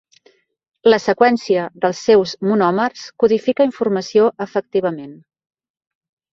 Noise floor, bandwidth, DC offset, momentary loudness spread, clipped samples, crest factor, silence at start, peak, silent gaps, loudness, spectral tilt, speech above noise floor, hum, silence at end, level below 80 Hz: -55 dBFS; 7.6 kHz; under 0.1%; 7 LU; under 0.1%; 16 dB; 0.85 s; -2 dBFS; none; -17 LUFS; -5.5 dB/octave; 39 dB; none; 1.2 s; -60 dBFS